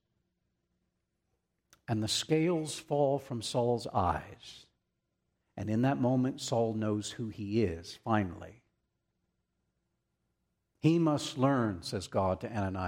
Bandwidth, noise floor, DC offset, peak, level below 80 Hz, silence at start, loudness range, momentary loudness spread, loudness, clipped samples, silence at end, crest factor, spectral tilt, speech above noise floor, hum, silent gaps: 16 kHz; -82 dBFS; under 0.1%; -14 dBFS; -62 dBFS; 1.9 s; 5 LU; 12 LU; -32 LUFS; under 0.1%; 0 s; 20 dB; -6 dB/octave; 51 dB; 60 Hz at -60 dBFS; none